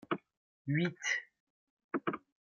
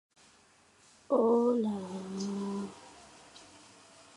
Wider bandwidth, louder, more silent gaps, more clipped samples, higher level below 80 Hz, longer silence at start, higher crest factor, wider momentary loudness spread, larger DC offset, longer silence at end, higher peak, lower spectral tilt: second, 7.2 kHz vs 11.5 kHz; second, -37 LUFS vs -32 LUFS; first, 0.37-0.65 s, 1.40-1.77 s, 1.84-1.89 s vs none; neither; second, -80 dBFS vs -74 dBFS; second, 0.1 s vs 1.1 s; about the same, 18 dB vs 20 dB; second, 8 LU vs 26 LU; neither; second, 0.3 s vs 0.7 s; second, -20 dBFS vs -16 dBFS; second, -5 dB/octave vs -6.5 dB/octave